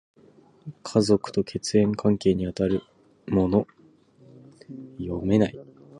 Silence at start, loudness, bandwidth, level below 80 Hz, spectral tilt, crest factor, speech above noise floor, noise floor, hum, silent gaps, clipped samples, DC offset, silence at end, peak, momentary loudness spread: 0.65 s; -24 LUFS; 11 kHz; -50 dBFS; -6.5 dB/octave; 20 dB; 32 dB; -56 dBFS; none; none; under 0.1%; under 0.1%; 0 s; -6 dBFS; 22 LU